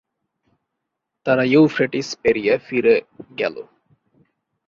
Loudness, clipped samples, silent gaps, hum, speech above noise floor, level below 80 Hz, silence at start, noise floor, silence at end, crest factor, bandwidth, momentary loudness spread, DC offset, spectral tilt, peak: -19 LUFS; under 0.1%; none; none; 61 dB; -60 dBFS; 1.25 s; -79 dBFS; 1.05 s; 18 dB; 7.6 kHz; 12 LU; under 0.1%; -6 dB/octave; -4 dBFS